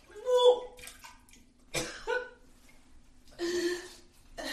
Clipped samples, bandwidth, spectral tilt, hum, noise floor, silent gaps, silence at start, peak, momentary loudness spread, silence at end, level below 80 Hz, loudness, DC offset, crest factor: under 0.1%; 13 kHz; -3 dB/octave; none; -58 dBFS; none; 0.1 s; -12 dBFS; 25 LU; 0 s; -58 dBFS; -31 LUFS; under 0.1%; 22 dB